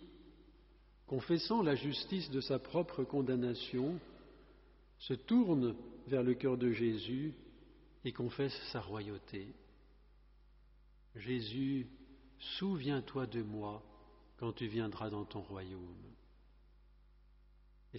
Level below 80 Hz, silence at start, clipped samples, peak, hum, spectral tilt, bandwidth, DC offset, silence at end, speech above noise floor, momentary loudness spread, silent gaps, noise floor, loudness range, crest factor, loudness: -64 dBFS; 0 s; under 0.1%; -22 dBFS; 50 Hz at -65 dBFS; -5.5 dB/octave; 5.8 kHz; under 0.1%; 0 s; 27 dB; 16 LU; none; -64 dBFS; 9 LU; 18 dB; -39 LUFS